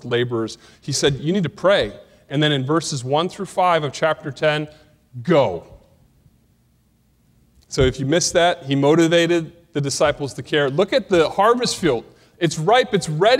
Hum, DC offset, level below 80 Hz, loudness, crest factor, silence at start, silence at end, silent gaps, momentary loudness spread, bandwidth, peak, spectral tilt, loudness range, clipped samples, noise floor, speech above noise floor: none; under 0.1%; -46 dBFS; -19 LUFS; 16 dB; 0.05 s; 0 s; none; 10 LU; 15 kHz; -4 dBFS; -4.5 dB/octave; 6 LU; under 0.1%; -60 dBFS; 41 dB